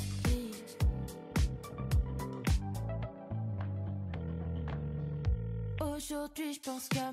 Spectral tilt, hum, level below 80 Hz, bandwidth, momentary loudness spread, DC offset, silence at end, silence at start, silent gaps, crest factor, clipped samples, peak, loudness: -6 dB/octave; none; -40 dBFS; 16 kHz; 6 LU; under 0.1%; 0 s; 0 s; none; 14 dB; under 0.1%; -22 dBFS; -37 LUFS